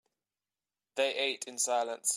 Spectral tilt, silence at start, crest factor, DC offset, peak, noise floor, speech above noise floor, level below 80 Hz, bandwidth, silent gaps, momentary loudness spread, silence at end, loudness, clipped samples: 1 dB/octave; 0.95 s; 18 dB; under 0.1%; -16 dBFS; under -90 dBFS; over 58 dB; under -90 dBFS; 16 kHz; none; 3 LU; 0 s; -32 LUFS; under 0.1%